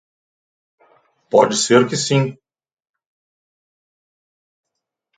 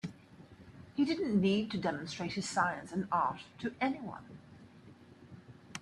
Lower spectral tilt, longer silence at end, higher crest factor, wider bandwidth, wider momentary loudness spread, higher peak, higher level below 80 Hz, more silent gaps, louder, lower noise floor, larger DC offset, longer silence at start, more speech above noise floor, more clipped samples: about the same, -4.5 dB/octave vs -5.5 dB/octave; first, 2.85 s vs 0 s; about the same, 22 dB vs 20 dB; second, 9.6 kHz vs 11.5 kHz; second, 5 LU vs 24 LU; first, 0 dBFS vs -18 dBFS; about the same, -66 dBFS vs -70 dBFS; neither; first, -16 LUFS vs -34 LUFS; first, -78 dBFS vs -57 dBFS; neither; first, 1.35 s vs 0.05 s; first, 63 dB vs 22 dB; neither